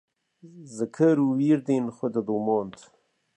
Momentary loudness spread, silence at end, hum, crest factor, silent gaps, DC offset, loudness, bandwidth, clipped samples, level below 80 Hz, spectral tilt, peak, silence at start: 12 LU; 0.65 s; none; 16 dB; none; under 0.1%; -25 LUFS; 10 kHz; under 0.1%; -72 dBFS; -8 dB/octave; -10 dBFS; 0.45 s